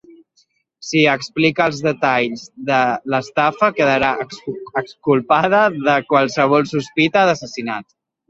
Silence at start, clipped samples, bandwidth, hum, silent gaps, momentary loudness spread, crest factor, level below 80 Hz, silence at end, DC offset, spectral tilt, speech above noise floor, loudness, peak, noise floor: 0.8 s; under 0.1%; 8 kHz; none; none; 10 LU; 16 dB; -56 dBFS; 0.45 s; under 0.1%; -5 dB/octave; 44 dB; -17 LUFS; -2 dBFS; -61 dBFS